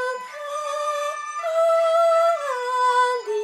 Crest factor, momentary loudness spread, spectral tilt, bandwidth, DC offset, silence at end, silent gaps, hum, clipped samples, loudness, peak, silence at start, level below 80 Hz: 12 dB; 10 LU; 1 dB/octave; 12.5 kHz; under 0.1%; 0 s; none; none; under 0.1%; -21 LUFS; -10 dBFS; 0 s; -88 dBFS